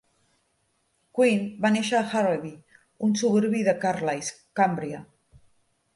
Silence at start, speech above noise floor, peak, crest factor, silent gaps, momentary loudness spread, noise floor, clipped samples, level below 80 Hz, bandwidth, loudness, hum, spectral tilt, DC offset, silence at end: 1.15 s; 47 dB; -8 dBFS; 18 dB; none; 10 LU; -71 dBFS; under 0.1%; -68 dBFS; 11.5 kHz; -25 LUFS; none; -5 dB/octave; under 0.1%; 0.9 s